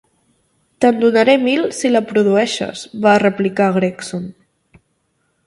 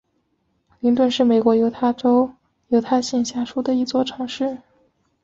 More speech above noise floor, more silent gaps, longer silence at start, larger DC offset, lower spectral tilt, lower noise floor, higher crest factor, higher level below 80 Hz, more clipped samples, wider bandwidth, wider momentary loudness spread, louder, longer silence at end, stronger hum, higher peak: about the same, 51 dB vs 50 dB; neither; about the same, 0.8 s vs 0.85 s; neither; about the same, -5 dB/octave vs -5 dB/octave; about the same, -65 dBFS vs -68 dBFS; about the same, 16 dB vs 16 dB; about the same, -60 dBFS vs -60 dBFS; neither; first, 11.5 kHz vs 7.8 kHz; first, 13 LU vs 9 LU; first, -15 LUFS vs -20 LUFS; first, 1.15 s vs 0.65 s; neither; first, 0 dBFS vs -4 dBFS